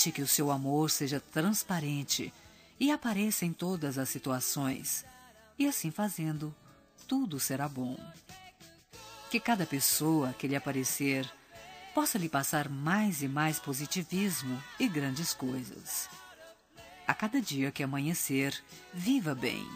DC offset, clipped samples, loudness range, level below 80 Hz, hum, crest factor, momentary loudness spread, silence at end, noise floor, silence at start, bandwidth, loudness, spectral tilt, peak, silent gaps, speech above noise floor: under 0.1%; under 0.1%; 4 LU; -68 dBFS; none; 22 dB; 13 LU; 0 s; -56 dBFS; 0 s; 15.5 kHz; -32 LUFS; -4 dB/octave; -10 dBFS; none; 24 dB